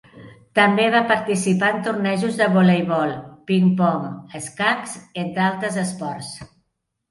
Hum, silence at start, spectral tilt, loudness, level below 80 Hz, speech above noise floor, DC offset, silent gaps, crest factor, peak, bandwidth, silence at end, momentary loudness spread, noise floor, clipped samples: none; 0.15 s; -5.5 dB/octave; -20 LUFS; -62 dBFS; 54 dB; under 0.1%; none; 18 dB; -2 dBFS; 11.5 kHz; 0.65 s; 15 LU; -74 dBFS; under 0.1%